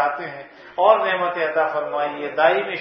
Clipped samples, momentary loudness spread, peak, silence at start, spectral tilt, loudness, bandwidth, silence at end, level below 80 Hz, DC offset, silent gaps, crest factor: under 0.1%; 15 LU; 0 dBFS; 0 s; -6.5 dB/octave; -20 LUFS; 5.6 kHz; 0 s; -68 dBFS; under 0.1%; none; 20 dB